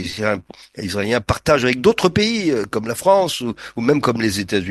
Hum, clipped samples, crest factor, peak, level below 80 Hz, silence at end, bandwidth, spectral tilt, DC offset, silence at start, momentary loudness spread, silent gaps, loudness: none; under 0.1%; 18 dB; 0 dBFS; -42 dBFS; 0 s; 12.5 kHz; -5 dB/octave; under 0.1%; 0 s; 10 LU; none; -18 LUFS